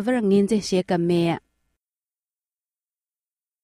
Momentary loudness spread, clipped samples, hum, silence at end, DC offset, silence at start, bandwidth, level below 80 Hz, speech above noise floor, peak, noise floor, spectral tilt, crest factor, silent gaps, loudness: 5 LU; under 0.1%; none; 2.25 s; under 0.1%; 0 s; 13 kHz; -60 dBFS; over 69 dB; -8 dBFS; under -90 dBFS; -6.5 dB/octave; 16 dB; none; -21 LUFS